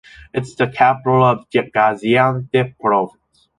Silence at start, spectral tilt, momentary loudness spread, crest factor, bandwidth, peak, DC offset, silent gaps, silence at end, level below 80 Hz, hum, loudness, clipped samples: 0.35 s; -7 dB/octave; 11 LU; 16 dB; 10.5 kHz; -2 dBFS; under 0.1%; none; 0.5 s; -52 dBFS; none; -17 LUFS; under 0.1%